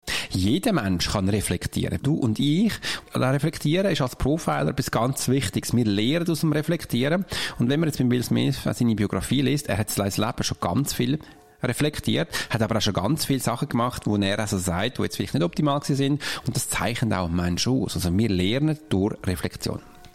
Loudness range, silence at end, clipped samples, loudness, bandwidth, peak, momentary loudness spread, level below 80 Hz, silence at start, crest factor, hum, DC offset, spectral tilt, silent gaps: 1 LU; 0 s; under 0.1%; -24 LUFS; 16.5 kHz; -10 dBFS; 4 LU; -44 dBFS; 0 s; 14 dB; none; 0.4%; -5 dB/octave; none